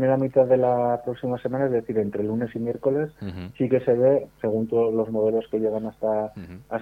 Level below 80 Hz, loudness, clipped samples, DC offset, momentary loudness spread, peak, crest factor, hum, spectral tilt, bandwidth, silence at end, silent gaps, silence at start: -58 dBFS; -24 LUFS; under 0.1%; under 0.1%; 9 LU; -8 dBFS; 16 dB; none; -10 dB/octave; 4.8 kHz; 0 s; none; 0 s